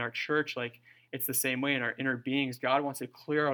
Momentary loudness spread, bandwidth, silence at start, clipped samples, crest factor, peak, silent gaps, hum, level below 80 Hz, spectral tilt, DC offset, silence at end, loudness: 9 LU; 19 kHz; 0 s; under 0.1%; 20 dB; -12 dBFS; none; none; -84 dBFS; -3.5 dB/octave; under 0.1%; 0 s; -31 LUFS